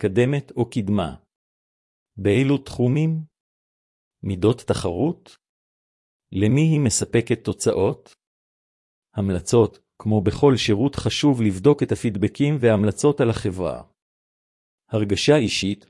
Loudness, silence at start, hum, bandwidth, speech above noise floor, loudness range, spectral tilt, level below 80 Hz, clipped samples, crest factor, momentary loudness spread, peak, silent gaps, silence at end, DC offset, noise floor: -21 LUFS; 0 s; none; 12 kHz; over 70 dB; 5 LU; -6 dB/octave; -52 dBFS; under 0.1%; 18 dB; 10 LU; -2 dBFS; 1.36-2.06 s, 3.40-4.11 s, 5.49-6.20 s, 8.27-9.02 s, 14.02-14.78 s; 0.15 s; under 0.1%; under -90 dBFS